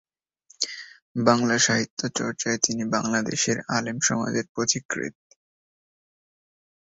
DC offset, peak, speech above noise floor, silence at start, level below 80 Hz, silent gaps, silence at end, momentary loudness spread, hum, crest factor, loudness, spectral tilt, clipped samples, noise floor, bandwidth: under 0.1%; -2 dBFS; 35 dB; 0.6 s; -64 dBFS; 1.02-1.15 s, 1.90-1.97 s, 4.49-4.55 s, 4.85-4.89 s; 1.75 s; 10 LU; none; 24 dB; -24 LUFS; -3 dB/octave; under 0.1%; -60 dBFS; 8 kHz